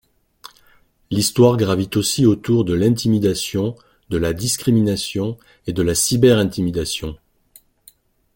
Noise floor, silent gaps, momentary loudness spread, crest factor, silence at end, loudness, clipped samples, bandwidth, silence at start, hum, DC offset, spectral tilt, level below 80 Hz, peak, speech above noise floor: -55 dBFS; none; 12 LU; 18 dB; 1.2 s; -18 LUFS; under 0.1%; 17 kHz; 0.45 s; none; under 0.1%; -5 dB/octave; -44 dBFS; -2 dBFS; 38 dB